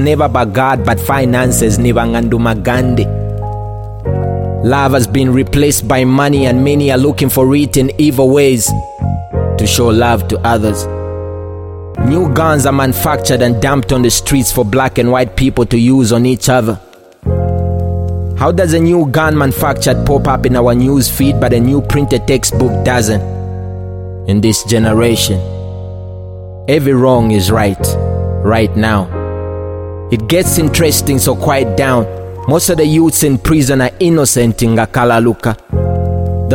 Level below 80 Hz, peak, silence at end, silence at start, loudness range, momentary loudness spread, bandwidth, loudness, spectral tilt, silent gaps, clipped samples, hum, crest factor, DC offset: -26 dBFS; 0 dBFS; 0 s; 0 s; 3 LU; 11 LU; 17 kHz; -11 LUFS; -5.5 dB/octave; none; under 0.1%; none; 12 dB; under 0.1%